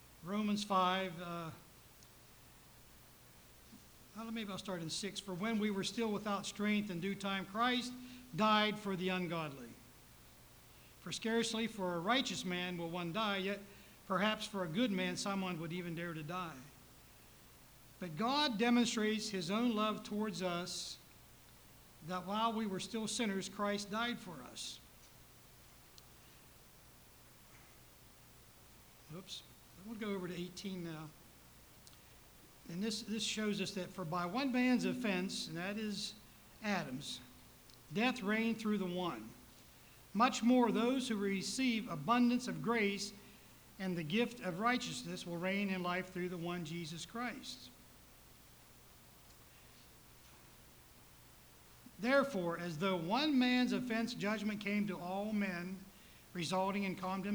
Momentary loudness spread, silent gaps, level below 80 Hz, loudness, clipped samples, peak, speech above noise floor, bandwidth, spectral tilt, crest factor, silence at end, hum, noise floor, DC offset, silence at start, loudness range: 25 LU; none; -70 dBFS; -38 LUFS; under 0.1%; -18 dBFS; 24 dB; over 20 kHz; -4.5 dB/octave; 22 dB; 0 s; none; -61 dBFS; under 0.1%; 0 s; 15 LU